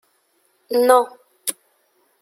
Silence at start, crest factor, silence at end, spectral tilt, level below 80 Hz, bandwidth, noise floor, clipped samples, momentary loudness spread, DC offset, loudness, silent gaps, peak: 0.7 s; 20 dB; 0.7 s; -1 dB/octave; -74 dBFS; 16.5 kHz; -64 dBFS; under 0.1%; 13 LU; under 0.1%; -19 LUFS; none; -2 dBFS